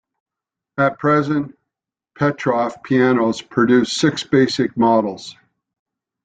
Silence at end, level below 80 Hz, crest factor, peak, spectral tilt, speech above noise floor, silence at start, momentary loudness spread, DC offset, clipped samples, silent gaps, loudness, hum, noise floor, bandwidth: 0.9 s; -58 dBFS; 16 dB; -2 dBFS; -5.5 dB/octave; 69 dB; 0.75 s; 10 LU; under 0.1%; under 0.1%; none; -18 LUFS; none; -86 dBFS; 9.4 kHz